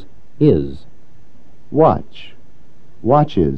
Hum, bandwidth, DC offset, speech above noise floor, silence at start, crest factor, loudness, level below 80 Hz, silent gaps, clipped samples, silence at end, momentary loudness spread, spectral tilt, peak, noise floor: none; 6.2 kHz; 5%; 35 dB; 0.4 s; 18 dB; -16 LUFS; -40 dBFS; none; under 0.1%; 0 s; 17 LU; -10 dB/octave; 0 dBFS; -50 dBFS